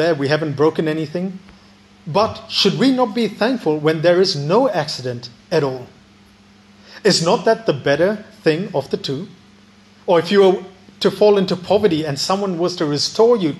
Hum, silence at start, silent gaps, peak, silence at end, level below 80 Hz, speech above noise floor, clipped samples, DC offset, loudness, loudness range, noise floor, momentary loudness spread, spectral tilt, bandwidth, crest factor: none; 0 s; none; -2 dBFS; 0 s; -60 dBFS; 31 dB; under 0.1%; under 0.1%; -17 LUFS; 3 LU; -48 dBFS; 11 LU; -5 dB/octave; 12.5 kHz; 16 dB